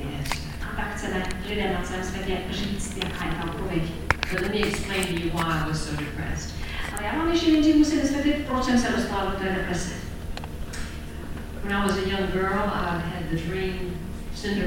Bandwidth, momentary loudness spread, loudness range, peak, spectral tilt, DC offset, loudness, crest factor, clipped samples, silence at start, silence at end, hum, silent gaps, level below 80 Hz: 17 kHz; 12 LU; 6 LU; -2 dBFS; -5 dB/octave; 0.5%; -27 LUFS; 24 dB; under 0.1%; 0 s; 0 s; none; none; -36 dBFS